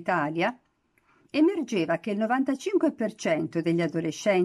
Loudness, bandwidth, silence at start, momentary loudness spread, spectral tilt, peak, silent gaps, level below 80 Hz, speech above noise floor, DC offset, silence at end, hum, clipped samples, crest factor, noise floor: -27 LUFS; 12 kHz; 0 s; 5 LU; -6 dB/octave; -12 dBFS; none; -74 dBFS; 42 dB; under 0.1%; 0 s; none; under 0.1%; 14 dB; -67 dBFS